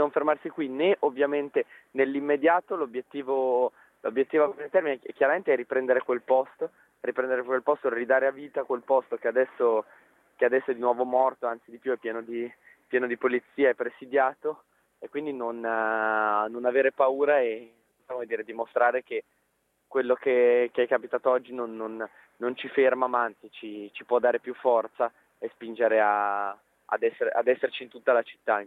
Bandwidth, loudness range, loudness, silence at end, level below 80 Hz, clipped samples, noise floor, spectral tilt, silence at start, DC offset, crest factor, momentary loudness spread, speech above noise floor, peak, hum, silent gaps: 4 kHz; 2 LU; -27 LUFS; 0 s; -82 dBFS; under 0.1%; -73 dBFS; -7 dB/octave; 0 s; under 0.1%; 18 dB; 12 LU; 47 dB; -8 dBFS; none; none